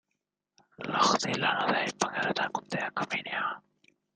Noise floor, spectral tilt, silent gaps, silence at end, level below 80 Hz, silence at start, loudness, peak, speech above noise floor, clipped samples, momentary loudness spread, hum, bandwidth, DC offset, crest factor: -84 dBFS; -3 dB/octave; none; 0.55 s; -74 dBFS; 0.8 s; -29 LUFS; -8 dBFS; 53 dB; under 0.1%; 8 LU; none; 10.5 kHz; under 0.1%; 22 dB